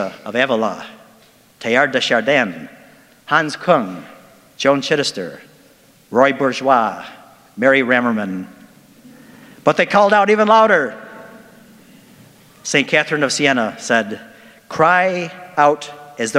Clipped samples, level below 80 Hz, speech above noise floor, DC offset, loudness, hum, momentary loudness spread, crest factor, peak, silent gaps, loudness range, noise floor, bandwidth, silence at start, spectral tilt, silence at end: under 0.1%; -66 dBFS; 34 dB; under 0.1%; -16 LUFS; none; 18 LU; 18 dB; 0 dBFS; none; 3 LU; -50 dBFS; 16 kHz; 0 s; -4 dB/octave; 0 s